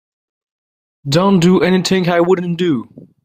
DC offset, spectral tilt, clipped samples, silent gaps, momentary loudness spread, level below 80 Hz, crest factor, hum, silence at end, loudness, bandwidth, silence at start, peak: under 0.1%; -6 dB/octave; under 0.1%; none; 7 LU; -50 dBFS; 14 dB; none; 0.25 s; -14 LUFS; 15 kHz; 1.05 s; -2 dBFS